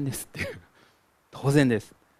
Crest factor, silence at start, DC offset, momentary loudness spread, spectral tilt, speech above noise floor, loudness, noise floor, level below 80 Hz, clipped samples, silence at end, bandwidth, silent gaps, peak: 22 dB; 0 s; under 0.1%; 21 LU; -6 dB/octave; 37 dB; -26 LUFS; -63 dBFS; -56 dBFS; under 0.1%; 0.35 s; 15.5 kHz; none; -6 dBFS